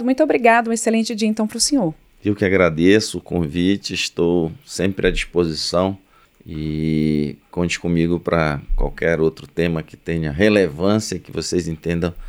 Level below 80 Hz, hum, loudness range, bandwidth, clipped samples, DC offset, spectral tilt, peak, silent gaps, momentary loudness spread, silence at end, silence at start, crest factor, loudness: -34 dBFS; none; 4 LU; 15.5 kHz; under 0.1%; under 0.1%; -5 dB/octave; -2 dBFS; none; 10 LU; 0 s; 0 s; 18 dB; -19 LUFS